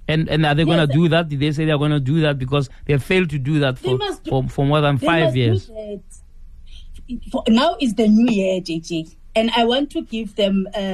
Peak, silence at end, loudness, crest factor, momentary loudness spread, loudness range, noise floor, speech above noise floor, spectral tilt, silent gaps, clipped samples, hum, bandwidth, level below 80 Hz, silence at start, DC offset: -4 dBFS; 0 s; -18 LUFS; 14 dB; 11 LU; 3 LU; -39 dBFS; 20 dB; -7 dB/octave; none; under 0.1%; none; 12.5 kHz; -40 dBFS; 0 s; under 0.1%